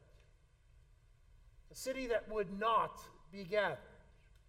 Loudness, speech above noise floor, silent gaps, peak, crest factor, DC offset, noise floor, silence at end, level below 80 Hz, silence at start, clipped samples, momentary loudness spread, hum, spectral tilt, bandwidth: -38 LUFS; 29 dB; none; -20 dBFS; 20 dB; under 0.1%; -67 dBFS; 0.55 s; -62 dBFS; 0.75 s; under 0.1%; 19 LU; none; -4 dB/octave; 16 kHz